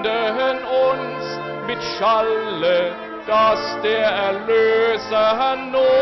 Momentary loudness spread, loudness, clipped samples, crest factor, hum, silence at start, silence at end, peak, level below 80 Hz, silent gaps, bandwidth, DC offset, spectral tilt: 9 LU; -19 LUFS; under 0.1%; 10 dB; none; 0 s; 0 s; -10 dBFS; -56 dBFS; none; 6.2 kHz; under 0.1%; -4.5 dB/octave